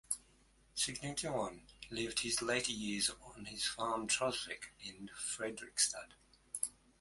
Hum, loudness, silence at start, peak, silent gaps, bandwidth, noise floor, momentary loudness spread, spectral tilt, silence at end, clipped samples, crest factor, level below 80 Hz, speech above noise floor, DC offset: none; -38 LUFS; 0.1 s; -16 dBFS; none; 12 kHz; -69 dBFS; 14 LU; -1.5 dB/octave; 0.3 s; under 0.1%; 24 dB; -66 dBFS; 29 dB; under 0.1%